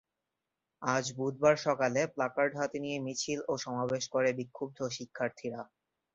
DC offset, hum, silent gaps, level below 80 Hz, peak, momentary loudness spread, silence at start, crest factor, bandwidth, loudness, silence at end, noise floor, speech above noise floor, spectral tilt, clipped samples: under 0.1%; none; none; -74 dBFS; -12 dBFS; 10 LU; 0.8 s; 22 dB; 8.4 kHz; -33 LUFS; 0.5 s; -88 dBFS; 55 dB; -4.5 dB/octave; under 0.1%